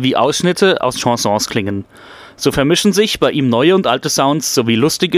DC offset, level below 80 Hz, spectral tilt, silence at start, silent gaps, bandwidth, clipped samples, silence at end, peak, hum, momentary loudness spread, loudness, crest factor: under 0.1%; -46 dBFS; -4 dB/octave; 0 s; none; 16 kHz; under 0.1%; 0 s; 0 dBFS; none; 6 LU; -14 LUFS; 14 dB